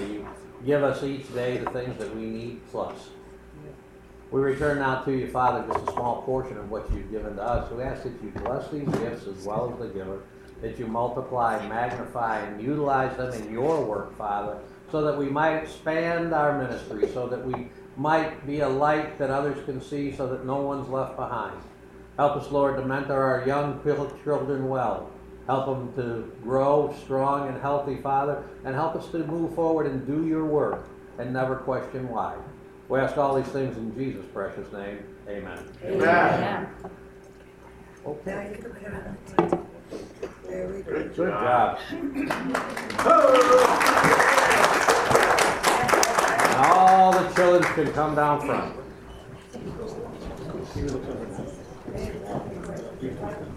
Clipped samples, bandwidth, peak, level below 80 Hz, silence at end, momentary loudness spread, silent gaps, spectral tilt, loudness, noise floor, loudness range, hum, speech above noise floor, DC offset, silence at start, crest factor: under 0.1%; 16 kHz; -2 dBFS; -48 dBFS; 0 s; 18 LU; none; -5 dB/octave; -25 LUFS; -47 dBFS; 13 LU; none; 22 dB; under 0.1%; 0 s; 24 dB